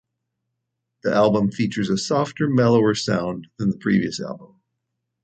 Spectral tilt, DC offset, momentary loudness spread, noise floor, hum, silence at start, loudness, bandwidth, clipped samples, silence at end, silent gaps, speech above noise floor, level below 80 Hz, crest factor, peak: -6 dB/octave; under 0.1%; 12 LU; -79 dBFS; none; 1.05 s; -21 LUFS; 9 kHz; under 0.1%; 0.8 s; none; 59 dB; -56 dBFS; 16 dB; -6 dBFS